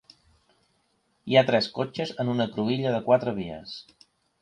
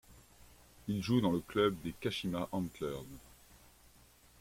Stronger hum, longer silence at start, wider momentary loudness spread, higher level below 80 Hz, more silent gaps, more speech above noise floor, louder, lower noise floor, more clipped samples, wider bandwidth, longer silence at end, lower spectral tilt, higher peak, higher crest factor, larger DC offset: neither; first, 1.25 s vs 0.1 s; first, 18 LU vs 15 LU; about the same, -64 dBFS vs -62 dBFS; neither; first, 45 dB vs 28 dB; first, -25 LUFS vs -36 LUFS; first, -70 dBFS vs -63 dBFS; neither; second, 10 kHz vs 16.5 kHz; second, 0.6 s vs 1.2 s; about the same, -6.5 dB/octave vs -6 dB/octave; first, -6 dBFS vs -18 dBFS; about the same, 22 dB vs 20 dB; neither